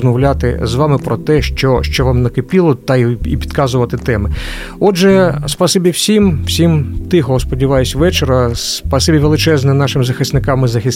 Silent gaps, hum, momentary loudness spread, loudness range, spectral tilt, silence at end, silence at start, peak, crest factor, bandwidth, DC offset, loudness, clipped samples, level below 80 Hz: none; none; 5 LU; 2 LU; -5.5 dB/octave; 0 s; 0 s; 0 dBFS; 12 dB; 16.5 kHz; under 0.1%; -13 LUFS; under 0.1%; -24 dBFS